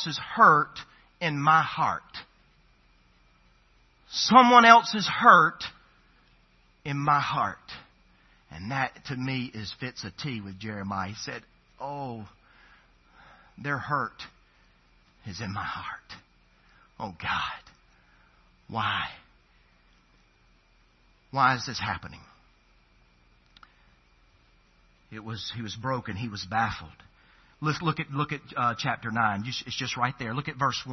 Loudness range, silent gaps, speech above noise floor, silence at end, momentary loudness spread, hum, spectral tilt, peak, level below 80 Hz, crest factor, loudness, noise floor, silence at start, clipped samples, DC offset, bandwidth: 17 LU; none; 36 dB; 0 s; 23 LU; none; -2.5 dB/octave; 0 dBFS; -62 dBFS; 28 dB; -25 LUFS; -62 dBFS; 0 s; under 0.1%; under 0.1%; 6.2 kHz